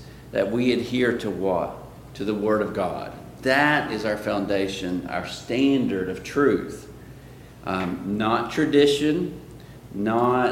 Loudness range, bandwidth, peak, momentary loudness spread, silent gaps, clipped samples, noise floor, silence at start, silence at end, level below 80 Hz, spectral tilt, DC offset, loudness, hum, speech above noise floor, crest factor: 2 LU; 16.5 kHz; -4 dBFS; 18 LU; none; under 0.1%; -44 dBFS; 0 s; 0 s; -50 dBFS; -5.5 dB/octave; under 0.1%; -24 LUFS; none; 21 dB; 20 dB